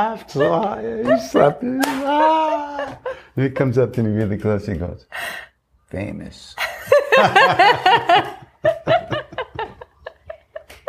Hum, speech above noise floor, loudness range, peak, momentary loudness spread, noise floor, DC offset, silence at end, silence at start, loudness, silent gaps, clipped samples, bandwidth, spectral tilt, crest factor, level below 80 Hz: none; 22 dB; 7 LU; 0 dBFS; 18 LU; -40 dBFS; under 0.1%; 0.15 s; 0 s; -18 LUFS; none; under 0.1%; 15.5 kHz; -5.5 dB/octave; 18 dB; -48 dBFS